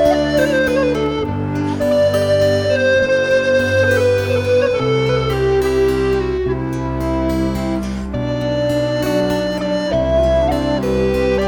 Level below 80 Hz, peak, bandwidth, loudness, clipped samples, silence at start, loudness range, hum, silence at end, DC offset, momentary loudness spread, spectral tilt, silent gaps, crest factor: -30 dBFS; -2 dBFS; 19 kHz; -16 LUFS; under 0.1%; 0 s; 4 LU; none; 0 s; 0.1%; 6 LU; -6 dB/octave; none; 14 dB